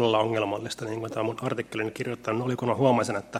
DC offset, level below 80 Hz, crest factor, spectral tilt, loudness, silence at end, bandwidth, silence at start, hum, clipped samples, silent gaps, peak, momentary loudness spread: under 0.1%; -66 dBFS; 18 dB; -5.5 dB/octave; -28 LUFS; 0 s; 15.5 kHz; 0 s; none; under 0.1%; none; -10 dBFS; 9 LU